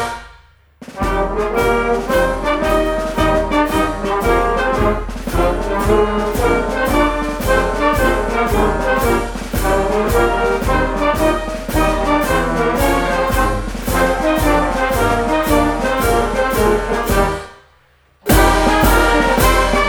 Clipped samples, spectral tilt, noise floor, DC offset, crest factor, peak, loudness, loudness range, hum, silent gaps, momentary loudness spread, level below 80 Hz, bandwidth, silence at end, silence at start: under 0.1%; -5 dB/octave; -53 dBFS; under 0.1%; 16 dB; 0 dBFS; -16 LUFS; 1 LU; none; none; 6 LU; -24 dBFS; over 20 kHz; 0 s; 0 s